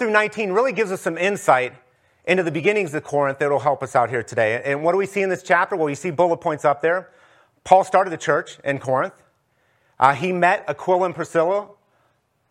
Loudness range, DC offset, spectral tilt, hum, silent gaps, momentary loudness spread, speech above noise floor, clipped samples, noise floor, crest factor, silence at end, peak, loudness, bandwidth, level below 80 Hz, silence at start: 2 LU; under 0.1%; -5.5 dB/octave; none; none; 6 LU; 46 dB; under 0.1%; -65 dBFS; 20 dB; 0.85 s; 0 dBFS; -20 LUFS; 14 kHz; -68 dBFS; 0 s